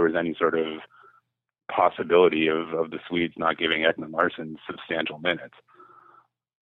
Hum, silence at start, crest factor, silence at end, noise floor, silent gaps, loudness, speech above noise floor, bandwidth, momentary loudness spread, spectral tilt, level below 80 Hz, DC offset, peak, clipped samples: none; 0 s; 20 dB; 1.15 s; -64 dBFS; none; -24 LUFS; 39 dB; 4.2 kHz; 13 LU; -7.5 dB/octave; -64 dBFS; under 0.1%; -6 dBFS; under 0.1%